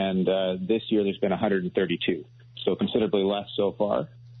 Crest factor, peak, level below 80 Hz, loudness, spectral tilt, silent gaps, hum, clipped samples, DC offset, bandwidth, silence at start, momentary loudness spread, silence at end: 16 dB; -10 dBFS; -62 dBFS; -26 LUFS; -5 dB/octave; none; none; under 0.1%; under 0.1%; 4.3 kHz; 0 s; 6 LU; 0 s